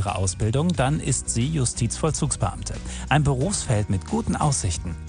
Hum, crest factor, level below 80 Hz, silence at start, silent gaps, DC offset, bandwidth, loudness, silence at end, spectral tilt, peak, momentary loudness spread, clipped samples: none; 18 dB; -36 dBFS; 0 s; none; under 0.1%; 10.5 kHz; -24 LUFS; 0 s; -5 dB/octave; -6 dBFS; 5 LU; under 0.1%